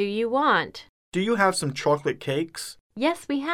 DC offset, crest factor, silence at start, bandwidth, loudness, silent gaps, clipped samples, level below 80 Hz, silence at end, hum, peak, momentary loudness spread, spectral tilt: under 0.1%; 18 dB; 0 s; 16.5 kHz; -25 LUFS; 0.89-1.12 s, 2.80-2.90 s; under 0.1%; -64 dBFS; 0 s; none; -6 dBFS; 13 LU; -4.5 dB/octave